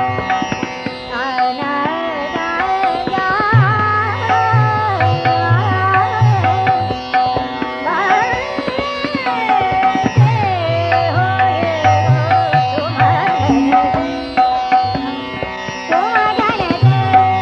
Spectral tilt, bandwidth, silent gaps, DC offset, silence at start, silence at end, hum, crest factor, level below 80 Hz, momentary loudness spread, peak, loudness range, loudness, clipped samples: -6.5 dB/octave; 7 kHz; none; under 0.1%; 0 s; 0 s; none; 14 dB; -42 dBFS; 7 LU; 0 dBFS; 2 LU; -15 LUFS; under 0.1%